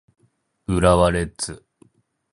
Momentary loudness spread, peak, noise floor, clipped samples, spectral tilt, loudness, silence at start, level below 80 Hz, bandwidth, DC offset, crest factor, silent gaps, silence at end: 19 LU; -2 dBFS; -58 dBFS; under 0.1%; -5.5 dB/octave; -20 LUFS; 0.7 s; -36 dBFS; 11.5 kHz; under 0.1%; 20 dB; none; 0.75 s